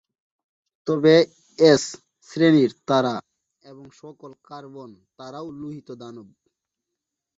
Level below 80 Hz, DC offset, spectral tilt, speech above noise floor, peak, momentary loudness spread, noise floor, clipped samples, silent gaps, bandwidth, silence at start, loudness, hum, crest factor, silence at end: -66 dBFS; under 0.1%; -5.5 dB/octave; 63 dB; -2 dBFS; 25 LU; -84 dBFS; under 0.1%; none; 8 kHz; 0.85 s; -19 LUFS; none; 22 dB; 1.15 s